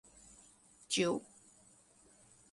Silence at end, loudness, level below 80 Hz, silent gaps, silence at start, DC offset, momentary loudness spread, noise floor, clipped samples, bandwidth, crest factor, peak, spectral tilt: 1.3 s; -36 LUFS; -74 dBFS; none; 0.9 s; under 0.1%; 26 LU; -65 dBFS; under 0.1%; 11.5 kHz; 22 dB; -20 dBFS; -3 dB/octave